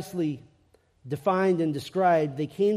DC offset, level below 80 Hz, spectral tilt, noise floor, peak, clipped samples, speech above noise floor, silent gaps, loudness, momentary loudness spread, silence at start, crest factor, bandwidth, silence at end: under 0.1%; -68 dBFS; -7 dB/octave; -63 dBFS; -10 dBFS; under 0.1%; 38 dB; none; -26 LUFS; 9 LU; 0 s; 16 dB; 15 kHz; 0 s